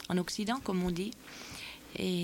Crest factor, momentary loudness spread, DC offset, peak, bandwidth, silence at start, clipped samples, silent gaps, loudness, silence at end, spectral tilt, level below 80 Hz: 14 dB; 11 LU; under 0.1%; -20 dBFS; 17 kHz; 0 s; under 0.1%; none; -36 LUFS; 0 s; -5 dB/octave; -56 dBFS